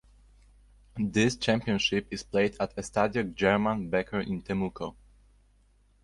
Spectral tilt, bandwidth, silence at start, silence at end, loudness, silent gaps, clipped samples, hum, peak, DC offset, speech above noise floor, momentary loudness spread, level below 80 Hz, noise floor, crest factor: -5 dB/octave; 11.5 kHz; 0.95 s; 1.1 s; -29 LUFS; none; under 0.1%; none; -10 dBFS; under 0.1%; 35 dB; 9 LU; -54 dBFS; -63 dBFS; 20 dB